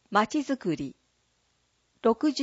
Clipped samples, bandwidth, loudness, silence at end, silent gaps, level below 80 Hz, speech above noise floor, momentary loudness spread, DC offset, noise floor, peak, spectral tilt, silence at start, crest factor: under 0.1%; 8 kHz; -28 LUFS; 0 s; none; -66 dBFS; 45 dB; 9 LU; under 0.1%; -71 dBFS; -8 dBFS; -5 dB/octave; 0.1 s; 20 dB